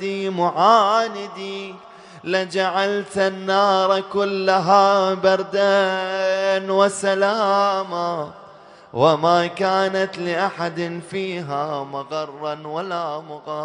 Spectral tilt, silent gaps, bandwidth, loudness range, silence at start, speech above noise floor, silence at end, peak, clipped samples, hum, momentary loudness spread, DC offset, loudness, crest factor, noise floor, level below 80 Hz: -4.5 dB/octave; none; 10.5 kHz; 6 LU; 0 s; 25 dB; 0 s; -2 dBFS; under 0.1%; none; 13 LU; under 0.1%; -20 LUFS; 18 dB; -44 dBFS; -68 dBFS